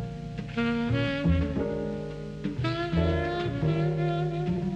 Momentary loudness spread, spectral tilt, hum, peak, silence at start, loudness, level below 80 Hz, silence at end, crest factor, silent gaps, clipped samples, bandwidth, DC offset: 9 LU; -8 dB/octave; 50 Hz at -40 dBFS; -12 dBFS; 0 s; -29 LUFS; -40 dBFS; 0 s; 16 dB; none; under 0.1%; 8.4 kHz; under 0.1%